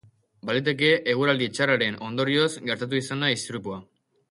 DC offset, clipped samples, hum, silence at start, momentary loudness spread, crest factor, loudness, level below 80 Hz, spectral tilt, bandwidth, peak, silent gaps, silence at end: under 0.1%; under 0.1%; none; 0.45 s; 12 LU; 18 dB; -24 LUFS; -66 dBFS; -4.5 dB/octave; 11.5 kHz; -8 dBFS; none; 0.5 s